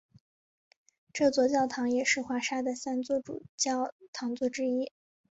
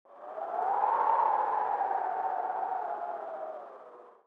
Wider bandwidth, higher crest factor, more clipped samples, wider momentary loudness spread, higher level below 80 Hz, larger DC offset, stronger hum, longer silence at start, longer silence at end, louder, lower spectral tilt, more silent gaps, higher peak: first, 8.2 kHz vs 4.9 kHz; about the same, 18 dB vs 18 dB; neither; second, 10 LU vs 16 LU; first, -72 dBFS vs under -90 dBFS; neither; neither; first, 1.15 s vs 0.1 s; first, 0.4 s vs 0.15 s; about the same, -30 LUFS vs -31 LUFS; second, -2.5 dB/octave vs -5 dB/octave; first, 3.49-3.58 s, 3.92-3.99 s, 4.08-4.13 s vs none; about the same, -14 dBFS vs -14 dBFS